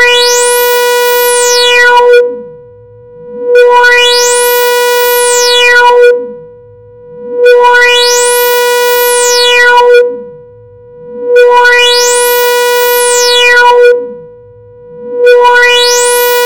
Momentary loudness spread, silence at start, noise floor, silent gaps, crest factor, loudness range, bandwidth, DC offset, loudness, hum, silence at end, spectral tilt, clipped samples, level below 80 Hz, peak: 7 LU; 0 s; -33 dBFS; none; 6 dB; 2 LU; 17.5 kHz; 1%; -5 LUFS; none; 0 s; 1.5 dB/octave; 0.9%; -48 dBFS; 0 dBFS